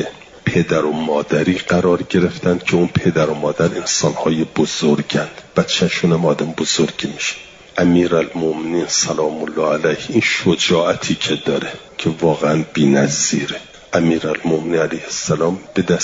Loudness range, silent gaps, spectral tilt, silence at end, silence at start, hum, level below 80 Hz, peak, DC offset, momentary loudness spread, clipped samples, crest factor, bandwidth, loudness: 1 LU; none; -4.5 dB/octave; 0 s; 0 s; none; -50 dBFS; -2 dBFS; under 0.1%; 6 LU; under 0.1%; 14 dB; 7.8 kHz; -17 LUFS